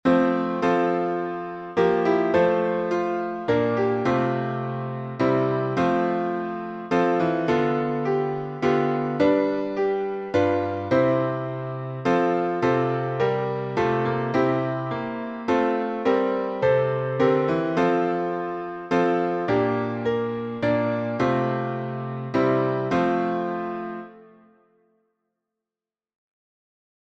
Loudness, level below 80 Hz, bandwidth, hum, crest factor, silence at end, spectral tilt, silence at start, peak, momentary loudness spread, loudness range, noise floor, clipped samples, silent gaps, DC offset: -24 LUFS; -60 dBFS; 8 kHz; none; 18 dB; 2.8 s; -8 dB/octave; 0.05 s; -6 dBFS; 8 LU; 3 LU; under -90 dBFS; under 0.1%; none; under 0.1%